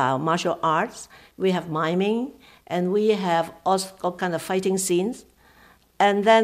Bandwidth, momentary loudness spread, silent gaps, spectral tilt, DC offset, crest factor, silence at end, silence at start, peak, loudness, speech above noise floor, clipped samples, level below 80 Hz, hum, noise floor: 15.5 kHz; 9 LU; none; -4.5 dB/octave; under 0.1%; 18 dB; 0 s; 0 s; -6 dBFS; -23 LUFS; 32 dB; under 0.1%; -64 dBFS; none; -55 dBFS